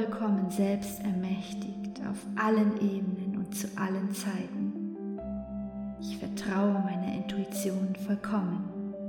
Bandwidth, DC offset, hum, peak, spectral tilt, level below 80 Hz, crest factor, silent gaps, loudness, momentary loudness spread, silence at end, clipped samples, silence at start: 18.5 kHz; under 0.1%; none; -14 dBFS; -6.5 dB/octave; -58 dBFS; 16 dB; none; -32 LUFS; 10 LU; 0 s; under 0.1%; 0 s